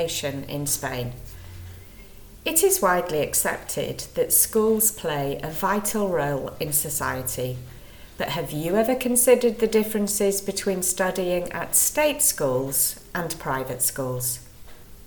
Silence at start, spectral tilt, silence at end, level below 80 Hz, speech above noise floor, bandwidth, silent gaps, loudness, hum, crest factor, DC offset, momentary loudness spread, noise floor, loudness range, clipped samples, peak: 0 s; -3 dB/octave; 0 s; -48 dBFS; 20 dB; 19.5 kHz; none; -23 LUFS; none; 22 dB; under 0.1%; 12 LU; -44 dBFS; 4 LU; under 0.1%; -4 dBFS